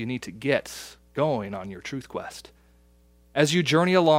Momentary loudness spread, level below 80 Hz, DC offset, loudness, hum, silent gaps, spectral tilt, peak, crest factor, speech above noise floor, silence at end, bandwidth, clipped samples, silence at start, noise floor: 18 LU; -58 dBFS; under 0.1%; -26 LUFS; 60 Hz at -55 dBFS; none; -5 dB/octave; -4 dBFS; 22 dB; 33 dB; 0 s; 16 kHz; under 0.1%; 0 s; -58 dBFS